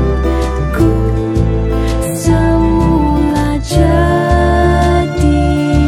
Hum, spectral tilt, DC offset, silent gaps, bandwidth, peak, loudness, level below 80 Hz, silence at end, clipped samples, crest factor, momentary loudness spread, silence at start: none; -7 dB/octave; under 0.1%; none; 15.5 kHz; 0 dBFS; -12 LUFS; -16 dBFS; 0 s; under 0.1%; 10 dB; 4 LU; 0 s